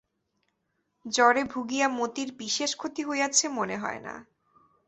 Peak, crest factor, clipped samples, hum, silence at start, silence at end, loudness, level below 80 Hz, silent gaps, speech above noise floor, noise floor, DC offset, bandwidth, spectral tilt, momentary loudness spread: -6 dBFS; 22 dB; under 0.1%; none; 1.05 s; 0.65 s; -27 LUFS; -70 dBFS; none; 50 dB; -77 dBFS; under 0.1%; 8.4 kHz; -1.5 dB/octave; 15 LU